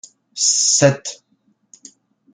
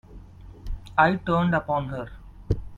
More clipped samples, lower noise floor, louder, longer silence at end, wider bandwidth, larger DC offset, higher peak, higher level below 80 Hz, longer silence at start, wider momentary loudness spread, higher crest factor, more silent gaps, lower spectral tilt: neither; first, -63 dBFS vs -44 dBFS; first, -15 LUFS vs -24 LUFS; first, 1.2 s vs 0 s; first, 10.5 kHz vs 7.4 kHz; neither; about the same, -2 dBFS vs -4 dBFS; second, -62 dBFS vs -38 dBFS; first, 0.35 s vs 0.1 s; about the same, 19 LU vs 19 LU; about the same, 20 dB vs 22 dB; neither; second, -2.5 dB/octave vs -8 dB/octave